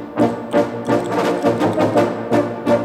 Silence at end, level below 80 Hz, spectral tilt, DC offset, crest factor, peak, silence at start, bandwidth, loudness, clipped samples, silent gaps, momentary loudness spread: 0 s; -52 dBFS; -6.5 dB/octave; under 0.1%; 14 dB; -2 dBFS; 0 s; 15.5 kHz; -18 LUFS; under 0.1%; none; 3 LU